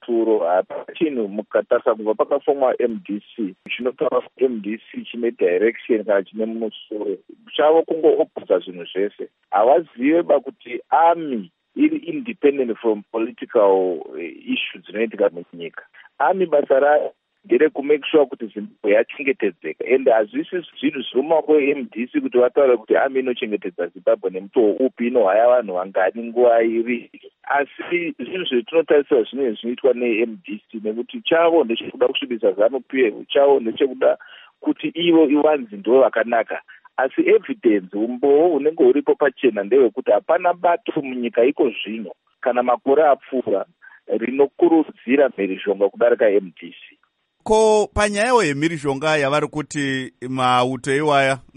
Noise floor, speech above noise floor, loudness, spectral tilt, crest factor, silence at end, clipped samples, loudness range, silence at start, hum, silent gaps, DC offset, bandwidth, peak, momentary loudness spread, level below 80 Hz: -66 dBFS; 47 dB; -19 LUFS; -5.5 dB/octave; 16 dB; 0.2 s; under 0.1%; 3 LU; 0.1 s; none; none; under 0.1%; 10.5 kHz; -4 dBFS; 12 LU; -54 dBFS